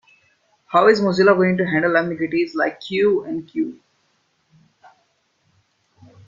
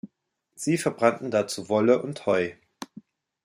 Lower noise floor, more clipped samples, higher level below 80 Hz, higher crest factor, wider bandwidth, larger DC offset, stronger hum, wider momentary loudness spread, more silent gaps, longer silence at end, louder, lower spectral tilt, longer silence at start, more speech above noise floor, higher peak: second, -66 dBFS vs -75 dBFS; neither; first, -62 dBFS vs -72 dBFS; about the same, 20 dB vs 22 dB; second, 7.4 kHz vs 16 kHz; neither; neither; second, 11 LU vs 20 LU; neither; first, 2.55 s vs 0.6 s; first, -18 LUFS vs -25 LUFS; first, -7 dB/octave vs -5 dB/octave; first, 0.7 s vs 0.05 s; about the same, 48 dB vs 51 dB; about the same, -2 dBFS vs -4 dBFS